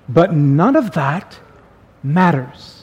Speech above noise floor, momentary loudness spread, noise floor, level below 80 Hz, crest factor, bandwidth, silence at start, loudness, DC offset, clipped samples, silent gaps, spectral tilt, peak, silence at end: 31 dB; 13 LU; -46 dBFS; -50 dBFS; 16 dB; 8.4 kHz; 0.1 s; -15 LUFS; under 0.1%; under 0.1%; none; -8.5 dB/octave; 0 dBFS; 0.15 s